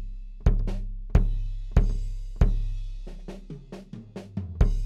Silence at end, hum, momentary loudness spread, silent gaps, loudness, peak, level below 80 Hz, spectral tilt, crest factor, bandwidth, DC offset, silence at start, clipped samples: 0 s; none; 16 LU; none; -29 LUFS; -6 dBFS; -26 dBFS; -8.5 dB/octave; 20 dB; 7 kHz; under 0.1%; 0 s; under 0.1%